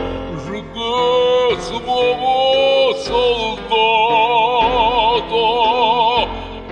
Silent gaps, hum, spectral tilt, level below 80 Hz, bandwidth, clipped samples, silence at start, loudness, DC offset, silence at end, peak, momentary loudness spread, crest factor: none; none; -4 dB/octave; -38 dBFS; 9.8 kHz; under 0.1%; 0 s; -15 LUFS; under 0.1%; 0 s; -2 dBFS; 10 LU; 14 dB